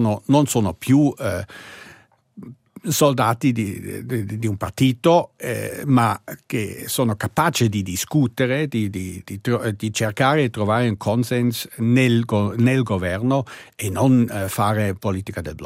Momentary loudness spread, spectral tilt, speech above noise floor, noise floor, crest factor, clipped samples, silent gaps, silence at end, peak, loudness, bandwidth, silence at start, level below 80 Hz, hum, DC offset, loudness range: 10 LU; -6 dB/octave; 30 dB; -50 dBFS; 18 dB; under 0.1%; none; 0 s; -2 dBFS; -20 LUFS; 16 kHz; 0 s; -56 dBFS; none; under 0.1%; 2 LU